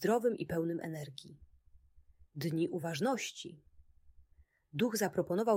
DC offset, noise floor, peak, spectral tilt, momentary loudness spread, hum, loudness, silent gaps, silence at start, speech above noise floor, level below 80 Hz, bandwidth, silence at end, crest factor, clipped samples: under 0.1%; -67 dBFS; -18 dBFS; -5.5 dB/octave; 16 LU; none; -36 LUFS; none; 0 s; 33 dB; -68 dBFS; 16 kHz; 0 s; 18 dB; under 0.1%